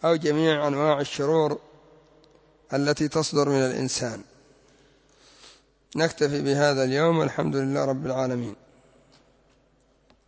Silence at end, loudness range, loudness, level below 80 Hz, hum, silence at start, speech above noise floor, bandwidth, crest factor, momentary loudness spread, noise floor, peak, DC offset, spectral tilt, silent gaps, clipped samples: 1.75 s; 3 LU; -24 LUFS; -62 dBFS; none; 0 s; 39 dB; 8 kHz; 18 dB; 9 LU; -63 dBFS; -8 dBFS; under 0.1%; -5 dB/octave; none; under 0.1%